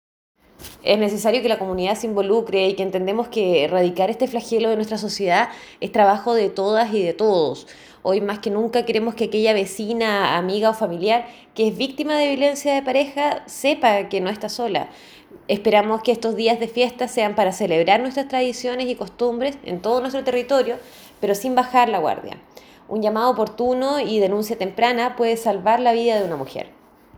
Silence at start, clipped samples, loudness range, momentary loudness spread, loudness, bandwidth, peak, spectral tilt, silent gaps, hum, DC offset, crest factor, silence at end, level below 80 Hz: 0.6 s; under 0.1%; 2 LU; 8 LU; -20 LUFS; over 20 kHz; -2 dBFS; -4.5 dB/octave; none; none; under 0.1%; 20 dB; 0.5 s; -60 dBFS